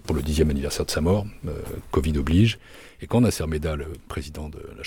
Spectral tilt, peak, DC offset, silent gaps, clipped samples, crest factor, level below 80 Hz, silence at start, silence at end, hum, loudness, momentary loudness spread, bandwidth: -6 dB/octave; -8 dBFS; under 0.1%; none; under 0.1%; 16 dB; -34 dBFS; 0.05 s; 0 s; none; -24 LUFS; 15 LU; 18 kHz